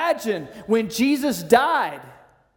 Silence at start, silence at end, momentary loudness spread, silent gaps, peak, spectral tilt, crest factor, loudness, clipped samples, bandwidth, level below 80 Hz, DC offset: 0 s; 0.45 s; 12 LU; none; 0 dBFS; -4 dB/octave; 22 dB; -21 LUFS; under 0.1%; 18 kHz; -60 dBFS; under 0.1%